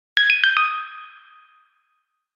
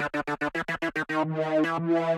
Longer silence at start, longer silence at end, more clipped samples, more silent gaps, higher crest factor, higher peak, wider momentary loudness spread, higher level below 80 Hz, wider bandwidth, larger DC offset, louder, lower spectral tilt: first, 0.15 s vs 0 s; first, 1.25 s vs 0 s; neither; neither; first, 22 dB vs 14 dB; first, -2 dBFS vs -14 dBFS; first, 21 LU vs 4 LU; second, under -90 dBFS vs -60 dBFS; second, 7.4 kHz vs 13 kHz; neither; first, -17 LUFS vs -28 LUFS; second, 5.5 dB/octave vs -6.5 dB/octave